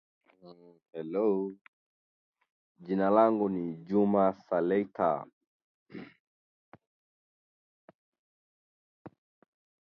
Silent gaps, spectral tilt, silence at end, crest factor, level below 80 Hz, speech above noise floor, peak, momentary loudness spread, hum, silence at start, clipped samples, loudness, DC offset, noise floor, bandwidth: 1.61-2.33 s, 2.50-2.75 s, 5.33-5.41 s, 5.47-5.86 s, 6.20-6.72 s, 6.87-7.88 s, 7.95-8.12 s, 8.19-9.05 s; -10.5 dB/octave; 0.85 s; 24 dB; -74 dBFS; over 61 dB; -10 dBFS; 24 LU; none; 0.45 s; under 0.1%; -29 LUFS; under 0.1%; under -90 dBFS; 5.6 kHz